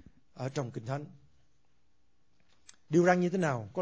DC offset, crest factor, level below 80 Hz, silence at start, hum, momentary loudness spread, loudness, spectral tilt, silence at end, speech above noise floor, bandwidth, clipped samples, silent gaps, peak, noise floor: under 0.1%; 22 dB; -70 dBFS; 0.35 s; none; 14 LU; -31 LUFS; -7 dB/octave; 0 s; 46 dB; 8 kHz; under 0.1%; none; -12 dBFS; -76 dBFS